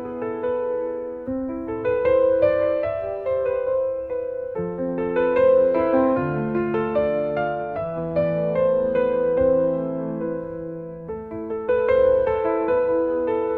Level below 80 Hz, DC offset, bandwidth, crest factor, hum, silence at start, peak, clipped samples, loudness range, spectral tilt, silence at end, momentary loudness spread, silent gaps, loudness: -50 dBFS; under 0.1%; 4.5 kHz; 14 dB; none; 0 s; -8 dBFS; under 0.1%; 2 LU; -10 dB/octave; 0 s; 11 LU; none; -22 LUFS